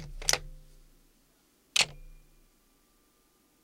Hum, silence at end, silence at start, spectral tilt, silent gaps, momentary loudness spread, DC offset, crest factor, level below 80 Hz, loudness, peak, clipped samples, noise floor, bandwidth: none; 1.45 s; 0 s; 0.5 dB/octave; none; 8 LU; under 0.1%; 32 dB; -50 dBFS; -29 LUFS; -4 dBFS; under 0.1%; -68 dBFS; 16 kHz